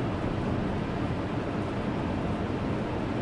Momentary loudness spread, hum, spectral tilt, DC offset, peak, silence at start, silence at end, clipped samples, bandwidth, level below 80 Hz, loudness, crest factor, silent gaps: 1 LU; none; -8 dB/octave; under 0.1%; -16 dBFS; 0 s; 0 s; under 0.1%; 11 kHz; -42 dBFS; -31 LUFS; 14 dB; none